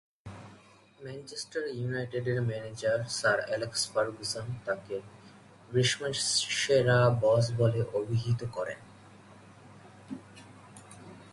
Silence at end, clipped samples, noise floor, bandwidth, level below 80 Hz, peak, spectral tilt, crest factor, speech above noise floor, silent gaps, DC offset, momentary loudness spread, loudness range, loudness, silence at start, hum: 0 s; under 0.1%; -57 dBFS; 11.5 kHz; -62 dBFS; -12 dBFS; -4 dB/octave; 20 dB; 27 dB; none; under 0.1%; 23 LU; 8 LU; -30 LUFS; 0.25 s; none